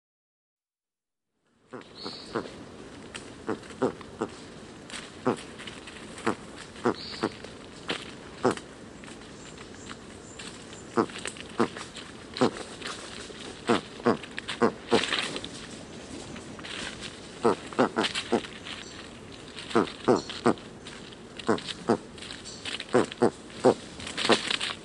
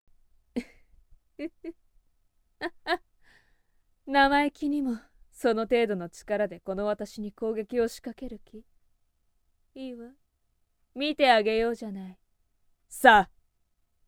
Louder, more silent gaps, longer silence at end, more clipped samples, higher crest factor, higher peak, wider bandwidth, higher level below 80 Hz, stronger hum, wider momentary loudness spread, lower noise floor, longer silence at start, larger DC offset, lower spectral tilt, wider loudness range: second, -30 LUFS vs -26 LUFS; neither; second, 0 s vs 0.85 s; neither; about the same, 24 dB vs 28 dB; second, -8 dBFS vs -2 dBFS; second, 11.5 kHz vs 19 kHz; about the same, -60 dBFS vs -56 dBFS; neither; second, 18 LU vs 21 LU; first, under -90 dBFS vs -73 dBFS; first, 1.7 s vs 0.55 s; neither; about the same, -4 dB/octave vs -4.5 dB/octave; second, 8 LU vs 13 LU